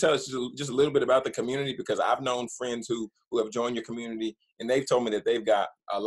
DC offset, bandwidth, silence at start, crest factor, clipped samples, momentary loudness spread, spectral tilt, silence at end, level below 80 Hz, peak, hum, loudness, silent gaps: under 0.1%; 12 kHz; 0 s; 18 dB; under 0.1%; 9 LU; -4.5 dB/octave; 0 s; -68 dBFS; -10 dBFS; none; -28 LUFS; 4.52-4.56 s